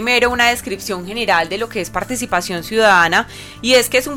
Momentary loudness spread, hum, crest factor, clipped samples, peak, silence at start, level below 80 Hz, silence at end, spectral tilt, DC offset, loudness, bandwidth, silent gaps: 11 LU; none; 14 dB; under 0.1%; -2 dBFS; 0 s; -42 dBFS; 0 s; -2.5 dB/octave; under 0.1%; -16 LUFS; 17 kHz; none